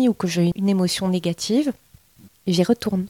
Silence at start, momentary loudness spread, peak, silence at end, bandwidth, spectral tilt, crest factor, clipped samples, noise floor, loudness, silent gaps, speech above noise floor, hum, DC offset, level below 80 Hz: 0 s; 7 LU; -6 dBFS; 0 s; 16.5 kHz; -6 dB/octave; 14 dB; under 0.1%; -52 dBFS; -21 LUFS; none; 31 dB; none; under 0.1%; -54 dBFS